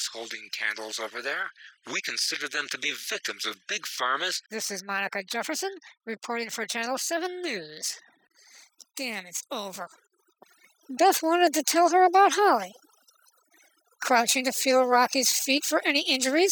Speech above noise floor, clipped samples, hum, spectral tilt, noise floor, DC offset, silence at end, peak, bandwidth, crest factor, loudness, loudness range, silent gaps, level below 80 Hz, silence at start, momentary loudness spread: 37 dB; under 0.1%; none; -0.5 dB/octave; -63 dBFS; under 0.1%; 0 s; -8 dBFS; 19 kHz; 18 dB; -26 LUFS; 9 LU; none; under -90 dBFS; 0 s; 14 LU